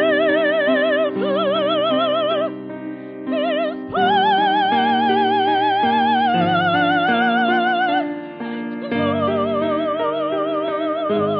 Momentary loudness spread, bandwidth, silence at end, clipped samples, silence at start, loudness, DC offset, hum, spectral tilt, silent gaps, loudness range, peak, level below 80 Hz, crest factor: 9 LU; 5.6 kHz; 0 s; under 0.1%; 0 s; -18 LUFS; under 0.1%; none; -8 dB/octave; none; 4 LU; -6 dBFS; -64 dBFS; 12 dB